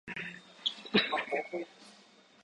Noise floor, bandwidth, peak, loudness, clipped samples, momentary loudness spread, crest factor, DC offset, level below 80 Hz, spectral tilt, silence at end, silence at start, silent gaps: -61 dBFS; 11 kHz; -14 dBFS; -33 LUFS; under 0.1%; 14 LU; 22 dB; under 0.1%; -74 dBFS; -4.5 dB/octave; 0.5 s; 0.05 s; none